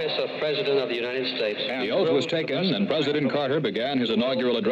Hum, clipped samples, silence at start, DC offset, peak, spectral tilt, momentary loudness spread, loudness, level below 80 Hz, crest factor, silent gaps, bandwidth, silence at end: none; under 0.1%; 0 s; under 0.1%; -12 dBFS; -6 dB/octave; 3 LU; -25 LUFS; -70 dBFS; 12 dB; none; 8.2 kHz; 0 s